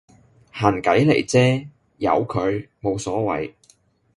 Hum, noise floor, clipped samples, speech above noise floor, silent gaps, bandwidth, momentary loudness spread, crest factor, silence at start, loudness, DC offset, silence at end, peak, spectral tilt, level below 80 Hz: none; -58 dBFS; under 0.1%; 39 dB; none; 11.5 kHz; 10 LU; 20 dB; 0.55 s; -21 LUFS; under 0.1%; 0.65 s; 0 dBFS; -6 dB/octave; -50 dBFS